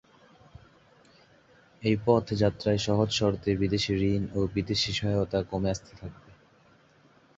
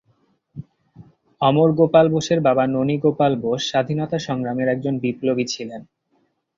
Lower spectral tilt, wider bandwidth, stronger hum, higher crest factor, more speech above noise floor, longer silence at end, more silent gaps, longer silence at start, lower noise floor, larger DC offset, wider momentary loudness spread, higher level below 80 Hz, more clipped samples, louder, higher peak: about the same, -6 dB/octave vs -6 dB/octave; about the same, 8 kHz vs 7.6 kHz; neither; about the same, 20 dB vs 18 dB; second, 33 dB vs 48 dB; first, 1.25 s vs 0.75 s; neither; first, 1.8 s vs 0.55 s; second, -60 dBFS vs -66 dBFS; neither; second, 7 LU vs 14 LU; first, -50 dBFS vs -60 dBFS; neither; second, -27 LUFS vs -19 LUFS; second, -8 dBFS vs -2 dBFS